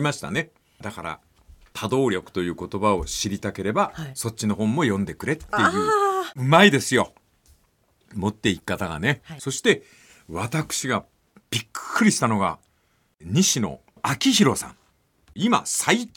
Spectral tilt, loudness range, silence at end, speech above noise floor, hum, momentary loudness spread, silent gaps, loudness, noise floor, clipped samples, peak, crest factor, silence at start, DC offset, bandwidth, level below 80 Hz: -4 dB/octave; 6 LU; 0.1 s; 43 dB; none; 13 LU; none; -23 LUFS; -66 dBFS; under 0.1%; -2 dBFS; 22 dB; 0 s; under 0.1%; 17.5 kHz; -52 dBFS